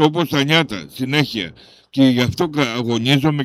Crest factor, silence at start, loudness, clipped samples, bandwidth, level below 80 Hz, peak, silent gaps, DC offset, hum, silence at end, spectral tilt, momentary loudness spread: 16 dB; 0 s; -18 LUFS; under 0.1%; 15 kHz; -50 dBFS; 0 dBFS; none; under 0.1%; none; 0 s; -5.5 dB/octave; 11 LU